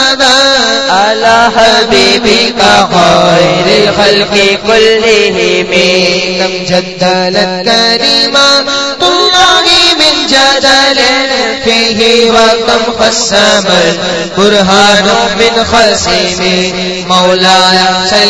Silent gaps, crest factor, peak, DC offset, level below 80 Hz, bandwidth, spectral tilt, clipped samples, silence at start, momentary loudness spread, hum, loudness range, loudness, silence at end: none; 6 dB; 0 dBFS; 1%; -36 dBFS; 11 kHz; -2.5 dB/octave; 2%; 0 s; 5 LU; none; 2 LU; -6 LUFS; 0 s